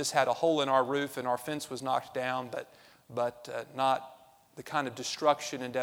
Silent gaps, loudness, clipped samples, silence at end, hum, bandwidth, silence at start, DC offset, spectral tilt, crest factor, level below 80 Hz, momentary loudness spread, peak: none; -31 LUFS; under 0.1%; 0 s; none; 19.5 kHz; 0 s; under 0.1%; -3.5 dB/octave; 22 dB; -76 dBFS; 13 LU; -10 dBFS